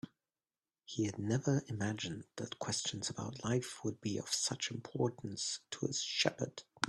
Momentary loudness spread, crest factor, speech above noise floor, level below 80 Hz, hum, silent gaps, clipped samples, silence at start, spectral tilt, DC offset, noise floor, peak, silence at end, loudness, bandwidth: 9 LU; 28 dB; over 52 dB; -72 dBFS; none; none; under 0.1%; 0.05 s; -4 dB/octave; under 0.1%; under -90 dBFS; -12 dBFS; 0 s; -38 LUFS; 12.5 kHz